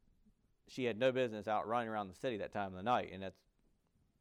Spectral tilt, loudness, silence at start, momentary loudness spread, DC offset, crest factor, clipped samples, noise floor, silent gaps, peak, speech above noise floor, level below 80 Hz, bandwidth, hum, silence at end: -6 dB/octave; -38 LUFS; 0.7 s; 12 LU; under 0.1%; 18 dB; under 0.1%; -76 dBFS; none; -22 dBFS; 38 dB; -74 dBFS; 12 kHz; none; 0.9 s